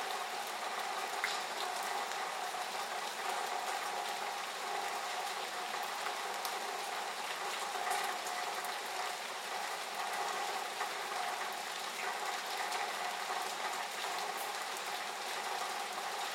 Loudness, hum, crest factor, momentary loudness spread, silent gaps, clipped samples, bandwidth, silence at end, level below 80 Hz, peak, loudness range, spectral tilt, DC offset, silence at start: -38 LUFS; none; 20 dB; 2 LU; none; under 0.1%; 16 kHz; 0 s; under -90 dBFS; -20 dBFS; 1 LU; 0.5 dB/octave; under 0.1%; 0 s